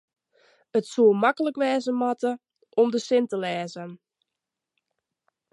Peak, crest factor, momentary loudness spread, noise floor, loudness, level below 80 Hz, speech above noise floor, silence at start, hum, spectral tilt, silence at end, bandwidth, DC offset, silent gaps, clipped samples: -8 dBFS; 18 dB; 14 LU; -86 dBFS; -24 LUFS; -82 dBFS; 63 dB; 0.75 s; none; -5.5 dB/octave; 1.6 s; 11.5 kHz; under 0.1%; none; under 0.1%